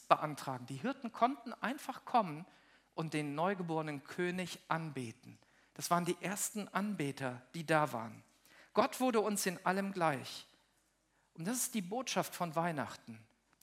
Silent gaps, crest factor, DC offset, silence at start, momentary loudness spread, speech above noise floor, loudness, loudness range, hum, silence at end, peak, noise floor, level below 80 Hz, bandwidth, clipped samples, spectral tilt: none; 26 dB; under 0.1%; 0 s; 13 LU; 39 dB; -37 LUFS; 4 LU; none; 0.4 s; -12 dBFS; -76 dBFS; -84 dBFS; 16 kHz; under 0.1%; -4.5 dB/octave